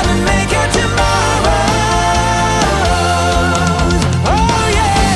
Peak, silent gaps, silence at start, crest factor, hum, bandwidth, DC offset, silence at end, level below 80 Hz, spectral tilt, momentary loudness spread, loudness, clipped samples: -2 dBFS; none; 0 s; 12 dB; none; 12 kHz; under 0.1%; 0 s; -20 dBFS; -4.5 dB/octave; 1 LU; -13 LUFS; under 0.1%